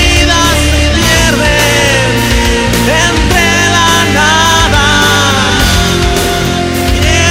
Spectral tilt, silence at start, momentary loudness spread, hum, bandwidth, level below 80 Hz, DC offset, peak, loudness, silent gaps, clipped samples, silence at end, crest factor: -3.5 dB/octave; 0 s; 4 LU; none; 16.5 kHz; -16 dBFS; under 0.1%; 0 dBFS; -8 LUFS; none; 0.2%; 0 s; 8 dB